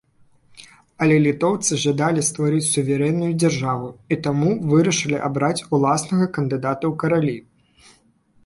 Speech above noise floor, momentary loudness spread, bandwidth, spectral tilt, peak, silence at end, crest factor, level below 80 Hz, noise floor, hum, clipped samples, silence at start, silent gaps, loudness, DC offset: 38 dB; 6 LU; 11.5 kHz; -5 dB/octave; -6 dBFS; 1.05 s; 16 dB; -56 dBFS; -58 dBFS; none; under 0.1%; 0.6 s; none; -20 LUFS; under 0.1%